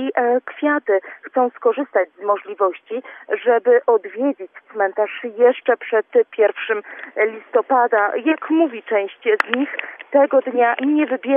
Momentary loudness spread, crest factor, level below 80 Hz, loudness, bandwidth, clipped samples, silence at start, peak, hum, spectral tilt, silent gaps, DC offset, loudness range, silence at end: 8 LU; 18 dB; -86 dBFS; -19 LUFS; 5 kHz; under 0.1%; 0 s; 0 dBFS; none; -5.5 dB/octave; none; under 0.1%; 2 LU; 0 s